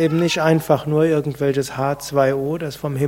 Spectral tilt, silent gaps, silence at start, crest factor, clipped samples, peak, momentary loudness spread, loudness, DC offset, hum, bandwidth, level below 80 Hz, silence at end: -6 dB/octave; none; 0 s; 16 dB; under 0.1%; -2 dBFS; 7 LU; -19 LUFS; under 0.1%; none; 16.5 kHz; -52 dBFS; 0 s